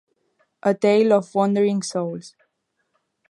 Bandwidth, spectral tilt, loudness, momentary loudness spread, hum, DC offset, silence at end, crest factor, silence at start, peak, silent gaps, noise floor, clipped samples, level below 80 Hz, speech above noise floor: 11 kHz; -6 dB/octave; -20 LUFS; 11 LU; none; under 0.1%; 1 s; 18 dB; 0.65 s; -4 dBFS; none; -73 dBFS; under 0.1%; -74 dBFS; 54 dB